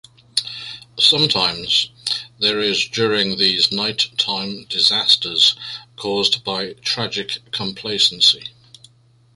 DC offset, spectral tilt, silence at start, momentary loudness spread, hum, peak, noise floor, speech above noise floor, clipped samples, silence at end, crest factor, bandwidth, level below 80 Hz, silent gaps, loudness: under 0.1%; -2.5 dB/octave; 0.35 s; 12 LU; none; 0 dBFS; -53 dBFS; 34 dB; under 0.1%; 0.85 s; 20 dB; 11.5 kHz; -58 dBFS; none; -17 LUFS